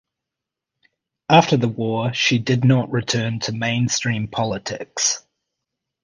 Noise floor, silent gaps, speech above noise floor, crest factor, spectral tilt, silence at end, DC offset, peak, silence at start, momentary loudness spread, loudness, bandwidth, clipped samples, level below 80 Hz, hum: -85 dBFS; none; 66 dB; 20 dB; -4.5 dB/octave; 0.85 s; under 0.1%; 0 dBFS; 1.3 s; 9 LU; -20 LUFS; 10 kHz; under 0.1%; -54 dBFS; none